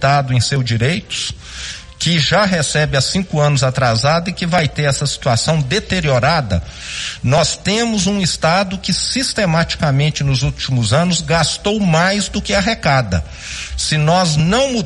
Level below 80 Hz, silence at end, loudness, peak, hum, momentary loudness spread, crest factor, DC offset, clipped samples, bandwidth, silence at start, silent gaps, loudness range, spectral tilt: -34 dBFS; 0 s; -15 LUFS; -2 dBFS; none; 8 LU; 14 dB; under 0.1%; under 0.1%; 11.5 kHz; 0 s; none; 1 LU; -4.5 dB/octave